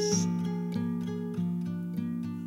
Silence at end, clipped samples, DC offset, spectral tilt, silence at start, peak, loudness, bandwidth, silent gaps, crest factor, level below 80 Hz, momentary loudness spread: 0 s; under 0.1%; under 0.1%; -5.5 dB/octave; 0 s; -14 dBFS; -32 LUFS; 12.5 kHz; none; 18 dB; -68 dBFS; 6 LU